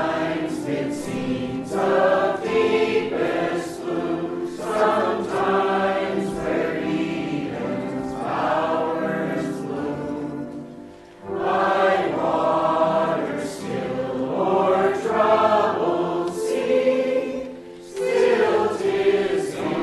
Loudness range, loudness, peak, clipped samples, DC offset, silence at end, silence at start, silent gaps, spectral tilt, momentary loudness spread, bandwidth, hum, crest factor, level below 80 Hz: 4 LU; -22 LUFS; -6 dBFS; under 0.1%; under 0.1%; 0 s; 0 s; none; -6 dB/octave; 10 LU; 12.5 kHz; none; 16 dB; -56 dBFS